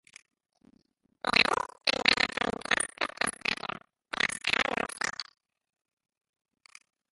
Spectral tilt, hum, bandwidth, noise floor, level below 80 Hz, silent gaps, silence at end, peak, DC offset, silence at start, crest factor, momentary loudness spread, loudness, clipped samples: -1 dB/octave; none; 12 kHz; -70 dBFS; -62 dBFS; none; 1.9 s; -4 dBFS; under 0.1%; 1.25 s; 30 dB; 15 LU; -28 LUFS; under 0.1%